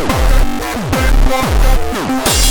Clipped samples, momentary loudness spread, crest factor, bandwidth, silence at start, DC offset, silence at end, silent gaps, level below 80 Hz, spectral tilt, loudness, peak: under 0.1%; 4 LU; 12 dB; 19.5 kHz; 0 s; under 0.1%; 0 s; none; -14 dBFS; -4 dB/octave; -15 LUFS; 0 dBFS